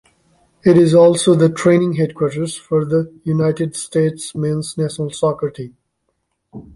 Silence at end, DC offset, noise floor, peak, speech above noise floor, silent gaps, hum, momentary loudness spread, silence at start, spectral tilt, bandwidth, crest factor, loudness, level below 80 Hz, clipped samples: 0.15 s; under 0.1%; -70 dBFS; -2 dBFS; 55 dB; none; none; 12 LU; 0.65 s; -6.5 dB/octave; 11.5 kHz; 14 dB; -16 LUFS; -54 dBFS; under 0.1%